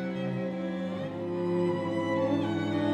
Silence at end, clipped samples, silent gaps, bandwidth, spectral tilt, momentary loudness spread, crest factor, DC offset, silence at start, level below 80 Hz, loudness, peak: 0 s; under 0.1%; none; 9.4 kHz; -8 dB/octave; 6 LU; 14 dB; under 0.1%; 0 s; -72 dBFS; -31 LUFS; -16 dBFS